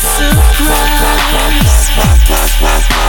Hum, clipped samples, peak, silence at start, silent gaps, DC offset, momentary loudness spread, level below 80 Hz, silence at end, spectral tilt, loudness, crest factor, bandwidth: none; 0.2%; 0 dBFS; 0 s; none; under 0.1%; 2 LU; -10 dBFS; 0 s; -3.5 dB/octave; -10 LUFS; 8 dB; 19 kHz